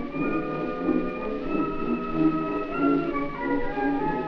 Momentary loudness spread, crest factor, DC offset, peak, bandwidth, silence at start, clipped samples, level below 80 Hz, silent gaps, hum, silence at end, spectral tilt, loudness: 5 LU; 14 dB; under 0.1%; -12 dBFS; 6 kHz; 0 s; under 0.1%; -40 dBFS; none; none; 0 s; -9 dB/octave; -27 LUFS